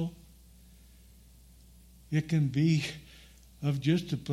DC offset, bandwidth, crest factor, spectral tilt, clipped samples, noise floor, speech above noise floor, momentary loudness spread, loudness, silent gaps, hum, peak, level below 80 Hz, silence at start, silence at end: under 0.1%; 13.5 kHz; 18 dB; -7 dB/octave; under 0.1%; -56 dBFS; 27 dB; 12 LU; -30 LUFS; none; none; -14 dBFS; -58 dBFS; 0 s; 0 s